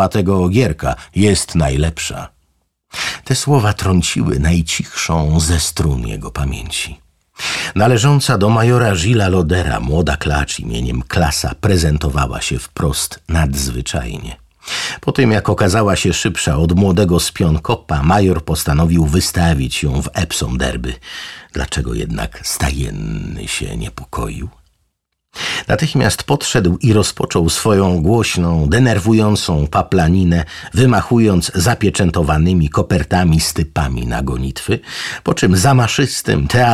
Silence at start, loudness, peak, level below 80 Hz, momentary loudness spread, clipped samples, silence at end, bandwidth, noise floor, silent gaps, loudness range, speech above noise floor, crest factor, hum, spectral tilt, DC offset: 0 s; -15 LUFS; -2 dBFS; -26 dBFS; 10 LU; under 0.1%; 0 s; 15.5 kHz; -69 dBFS; none; 6 LU; 54 dB; 14 dB; none; -5 dB/octave; 0.3%